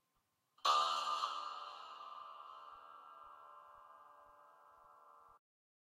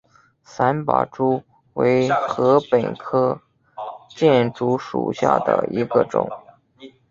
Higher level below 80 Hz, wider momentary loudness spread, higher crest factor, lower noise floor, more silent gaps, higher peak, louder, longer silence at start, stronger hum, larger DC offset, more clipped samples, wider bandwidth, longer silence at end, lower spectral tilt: second, under -90 dBFS vs -60 dBFS; first, 27 LU vs 16 LU; about the same, 24 dB vs 20 dB; first, -83 dBFS vs -52 dBFS; neither; second, -20 dBFS vs -2 dBFS; second, -39 LUFS vs -20 LUFS; first, 0.65 s vs 0.5 s; neither; neither; neither; first, 15 kHz vs 7.6 kHz; first, 0.55 s vs 0.25 s; second, 1.5 dB/octave vs -7 dB/octave